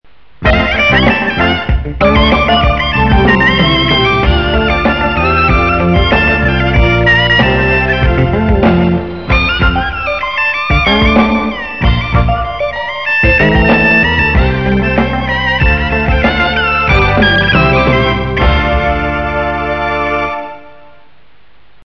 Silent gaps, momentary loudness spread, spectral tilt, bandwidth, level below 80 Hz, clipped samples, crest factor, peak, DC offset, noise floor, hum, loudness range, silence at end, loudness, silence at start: none; 7 LU; -7 dB/octave; 6.6 kHz; -18 dBFS; under 0.1%; 10 dB; 0 dBFS; 2%; -49 dBFS; none; 2 LU; 1.15 s; -10 LUFS; 0.4 s